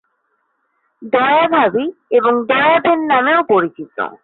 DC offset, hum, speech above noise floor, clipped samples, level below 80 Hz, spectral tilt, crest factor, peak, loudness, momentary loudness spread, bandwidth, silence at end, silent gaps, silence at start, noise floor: under 0.1%; none; 52 dB; under 0.1%; -64 dBFS; -9.5 dB/octave; 12 dB; -2 dBFS; -14 LUFS; 9 LU; 4.3 kHz; 0.1 s; none; 1 s; -66 dBFS